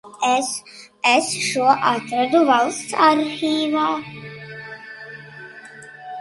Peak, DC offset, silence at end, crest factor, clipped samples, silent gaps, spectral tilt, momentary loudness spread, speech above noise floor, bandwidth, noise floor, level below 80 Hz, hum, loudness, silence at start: -2 dBFS; under 0.1%; 0 s; 20 dB; under 0.1%; none; -3 dB/octave; 21 LU; 22 dB; 11.5 kHz; -40 dBFS; -68 dBFS; none; -19 LUFS; 0.05 s